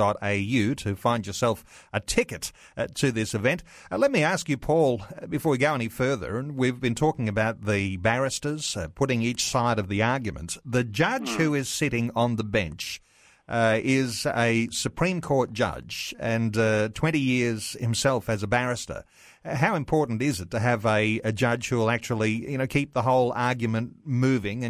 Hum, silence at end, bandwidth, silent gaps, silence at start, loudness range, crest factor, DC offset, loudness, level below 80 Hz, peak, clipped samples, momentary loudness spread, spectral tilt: none; 0 s; 15.5 kHz; none; 0 s; 2 LU; 18 dB; under 0.1%; -26 LUFS; -50 dBFS; -6 dBFS; under 0.1%; 8 LU; -5 dB/octave